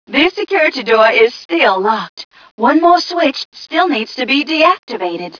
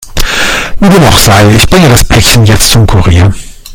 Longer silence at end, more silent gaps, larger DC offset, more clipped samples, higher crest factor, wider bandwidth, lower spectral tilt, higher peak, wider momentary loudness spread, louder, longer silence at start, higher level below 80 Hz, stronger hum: about the same, 0 s vs 0 s; first, 1.45-1.49 s, 2.09-2.17 s, 2.25-2.31 s, 2.51-2.58 s, 3.45-3.52 s, 4.79-4.87 s vs none; neither; second, under 0.1% vs 10%; first, 14 dB vs 4 dB; second, 5.4 kHz vs over 20 kHz; about the same, -4 dB/octave vs -4.5 dB/octave; about the same, 0 dBFS vs 0 dBFS; first, 10 LU vs 7 LU; second, -13 LUFS vs -4 LUFS; about the same, 0.1 s vs 0 s; second, -56 dBFS vs -16 dBFS; neither